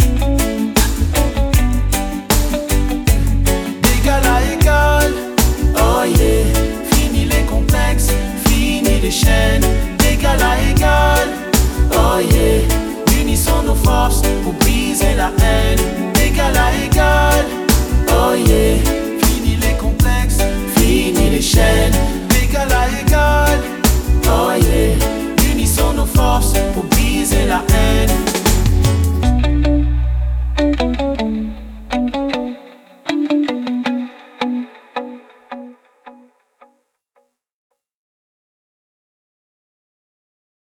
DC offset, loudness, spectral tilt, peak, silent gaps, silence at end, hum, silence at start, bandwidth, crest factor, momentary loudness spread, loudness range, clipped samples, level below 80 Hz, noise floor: under 0.1%; -15 LUFS; -4.5 dB/octave; 0 dBFS; none; 4.65 s; none; 0 s; over 20 kHz; 14 dB; 7 LU; 7 LU; under 0.1%; -18 dBFS; -62 dBFS